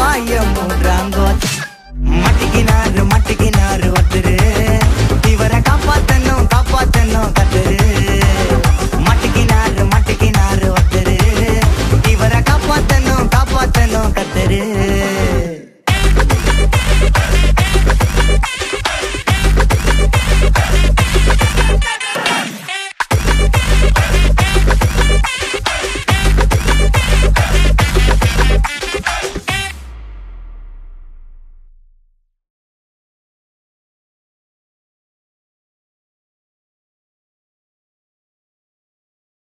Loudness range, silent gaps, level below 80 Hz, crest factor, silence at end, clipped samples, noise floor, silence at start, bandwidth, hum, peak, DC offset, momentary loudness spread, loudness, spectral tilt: 2 LU; none; -16 dBFS; 12 dB; 8.15 s; under 0.1%; -56 dBFS; 0 s; 15.5 kHz; none; 0 dBFS; under 0.1%; 5 LU; -13 LUFS; -5 dB/octave